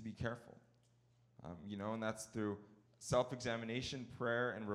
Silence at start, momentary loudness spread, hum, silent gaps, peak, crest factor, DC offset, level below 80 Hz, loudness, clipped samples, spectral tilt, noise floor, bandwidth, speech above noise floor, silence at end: 0 s; 15 LU; none; none; -22 dBFS; 20 dB; under 0.1%; -68 dBFS; -42 LUFS; under 0.1%; -5 dB/octave; -73 dBFS; 15 kHz; 31 dB; 0 s